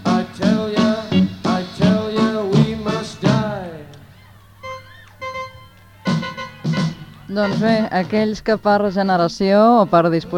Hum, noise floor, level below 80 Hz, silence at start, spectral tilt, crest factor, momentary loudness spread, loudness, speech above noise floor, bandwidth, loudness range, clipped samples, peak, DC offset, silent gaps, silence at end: none; -45 dBFS; -48 dBFS; 0 s; -7 dB/octave; 16 dB; 18 LU; -18 LUFS; 29 dB; 10.5 kHz; 10 LU; under 0.1%; -2 dBFS; under 0.1%; none; 0 s